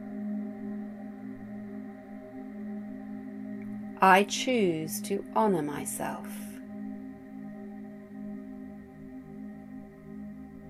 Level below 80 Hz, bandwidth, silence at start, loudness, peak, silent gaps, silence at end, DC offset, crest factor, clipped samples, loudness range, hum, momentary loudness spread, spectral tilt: -64 dBFS; 15.5 kHz; 0 s; -31 LUFS; -8 dBFS; none; 0 s; under 0.1%; 26 dB; under 0.1%; 16 LU; none; 18 LU; -4.5 dB/octave